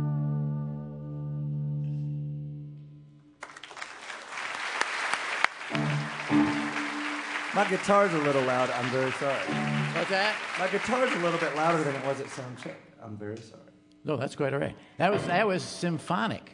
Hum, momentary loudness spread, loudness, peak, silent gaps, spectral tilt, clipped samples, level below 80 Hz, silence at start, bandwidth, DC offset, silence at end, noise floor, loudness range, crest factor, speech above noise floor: none; 15 LU; -29 LUFS; -4 dBFS; none; -5.5 dB/octave; under 0.1%; -66 dBFS; 0 s; 11 kHz; under 0.1%; 0 s; -52 dBFS; 9 LU; 26 dB; 24 dB